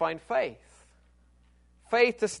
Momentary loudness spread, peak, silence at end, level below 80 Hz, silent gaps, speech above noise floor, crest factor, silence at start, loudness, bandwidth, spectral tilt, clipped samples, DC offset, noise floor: 6 LU; -8 dBFS; 0 s; -62 dBFS; none; 34 dB; 22 dB; 0 s; -27 LUFS; 10.5 kHz; -3.5 dB/octave; under 0.1%; under 0.1%; -61 dBFS